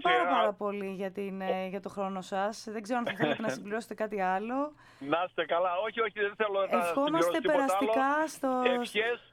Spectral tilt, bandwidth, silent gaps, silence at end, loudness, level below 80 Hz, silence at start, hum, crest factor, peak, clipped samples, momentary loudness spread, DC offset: -4.5 dB/octave; 17.5 kHz; none; 0.1 s; -31 LUFS; -72 dBFS; 0 s; none; 18 dB; -12 dBFS; under 0.1%; 9 LU; under 0.1%